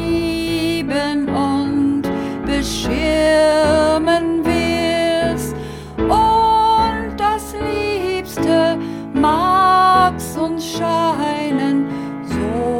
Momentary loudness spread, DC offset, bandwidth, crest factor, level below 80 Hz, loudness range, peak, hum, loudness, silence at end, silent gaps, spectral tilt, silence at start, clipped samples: 9 LU; under 0.1%; 17 kHz; 14 dB; -36 dBFS; 1 LU; -2 dBFS; none; -17 LUFS; 0 s; none; -5 dB/octave; 0 s; under 0.1%